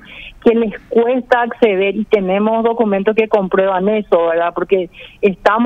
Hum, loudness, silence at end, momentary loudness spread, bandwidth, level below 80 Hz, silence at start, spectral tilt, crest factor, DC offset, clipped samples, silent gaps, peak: none; -15 LUFS; 0 s; 4 LU; 6.8 kHz; -46 dBFS; 0.1 s; -7.5 dB/octave; 14 dB; under 0.1%; under 0.1%; none; 0 dBFS